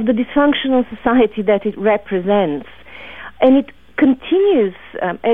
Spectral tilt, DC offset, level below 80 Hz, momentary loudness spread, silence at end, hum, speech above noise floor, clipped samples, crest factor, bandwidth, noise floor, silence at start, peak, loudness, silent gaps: -8.5 dB/octave; under 0.1%; -46 dBFS; 14 LU; 0 s; none; 21 dB; under 0.1%; 14 dB; 3.8 kHz; -36 dBFS; 0 s; -2 dBFS; -16 LUFS; none